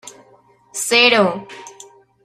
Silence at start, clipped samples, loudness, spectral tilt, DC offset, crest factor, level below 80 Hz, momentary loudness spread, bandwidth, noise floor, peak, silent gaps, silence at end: 0.05 s; under 0.1%; -14 LUFS; -2 dB/octave; under 0.1%; 18 dB; -68 dBFS; 24 LU; 15.5 kHz; -52 dBFS; 0 dBFS; none; 0.55 s